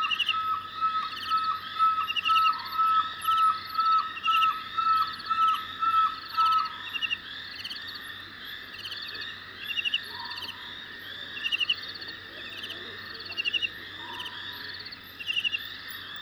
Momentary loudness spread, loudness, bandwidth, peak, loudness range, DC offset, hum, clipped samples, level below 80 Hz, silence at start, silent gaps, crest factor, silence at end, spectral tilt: 14 LU; -28 LUFS; over 20 kHz; -12 dBFS; 9 LU; under 0.1%; none; under 0.1%; -66 dBFS; 0 s; none; 16 dB; 0 s; -1 dB/octave